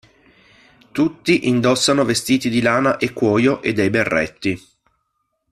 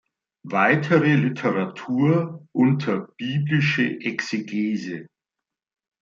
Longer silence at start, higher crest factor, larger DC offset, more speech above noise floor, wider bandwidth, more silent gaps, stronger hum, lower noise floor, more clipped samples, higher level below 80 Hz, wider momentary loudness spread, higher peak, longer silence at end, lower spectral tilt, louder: first, 0.95 s vs 0.45 s; about the same, 16 dB vs 18 dB; neither; second, 54 dB vs 65 dB; first, 14.5 kHz vs 7.4 kHz; neither; neither; second, -72 dBFS vs -87 dBFS; neither; first, -52 dBFS vs -66 dBFS; about the same, 7 LU vs 9 LU; about the same, -2 dBFS vs -4 dBFS; about the same, 0.95 s vs 0.95 s; second, -4.5 dB/octave vs -7 dB/octave; first, -17 LUFS vs -22 LUFS